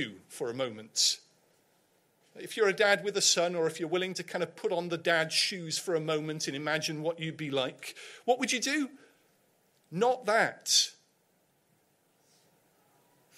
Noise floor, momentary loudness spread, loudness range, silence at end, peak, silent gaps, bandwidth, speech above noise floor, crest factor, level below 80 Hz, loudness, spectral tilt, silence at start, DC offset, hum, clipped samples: -71 dBFS; 12 LU; 4 LU; 2.45 s; -10 dBFS; none; 16 kHz; 41 dB; 22 dB; -82 dBFS; -30 LUFS; -2 dB/octave; 0 s; under 0.1%; none; under 0.1%